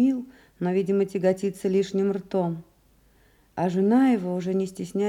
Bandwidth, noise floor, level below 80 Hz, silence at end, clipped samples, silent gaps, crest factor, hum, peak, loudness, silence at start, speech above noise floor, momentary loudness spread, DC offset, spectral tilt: 13.5 kHz; -60 dBFS; -64 dBFS; 0 s; under 0.1%; none; 14 dB; none; -10 dBFS; -25 LUFS; 0 s; 36 dB; 11 LU; under 0.1%; -7.5 dB/octave